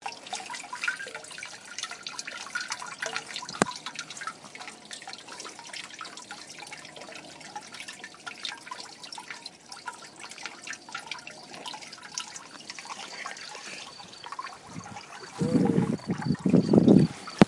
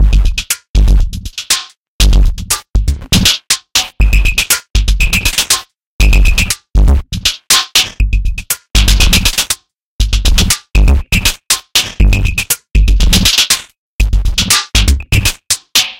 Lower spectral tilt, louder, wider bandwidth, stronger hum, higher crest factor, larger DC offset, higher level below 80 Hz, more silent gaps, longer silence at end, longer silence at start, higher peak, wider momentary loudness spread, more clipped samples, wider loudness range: first, -5 dB/octave vs -2.5 dB/octave; second, -31 LUFS vs -12 LUFS; second, 11.5 kHz vs 17 kHz; neither; first, 30 dB vs 10 dB; neither; second, -64 dBFS vs -12 dBFS; second, none vs 0.69-0.74 s, 1.77-1.99 s, 5.86-5.99 s, 9.82-9.99 s, 13.78-13.99 s; about the same, 0 s vs 0.05 s; about the same, 0 s vs 0 s; about the same, 0 dBFS vs 0 dBFS; first, 17 LU vs 7 LU; neither; first, 11 LU vs 1 LU